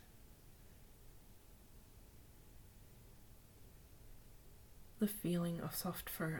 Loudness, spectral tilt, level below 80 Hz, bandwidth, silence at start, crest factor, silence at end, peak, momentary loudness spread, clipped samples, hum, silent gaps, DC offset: -41 LUFS; -5.5 dB/octave; -62 dBFS; 19 kHz; 0 s; 22 dB; 0 s; -24 dBFS; 23 LU; under 0.1%; none; none; under 0.1%